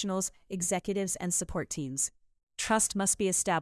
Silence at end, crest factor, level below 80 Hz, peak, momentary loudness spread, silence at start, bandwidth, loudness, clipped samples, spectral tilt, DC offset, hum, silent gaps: 0 s; 16 dB; -56 dBFS; -14 dBFS; 8 LU; 0 s; 12 kHz; -30 LUFS; under 0.1%; -3 dB/octave; under 0.1%; none; 2.43-2.47 s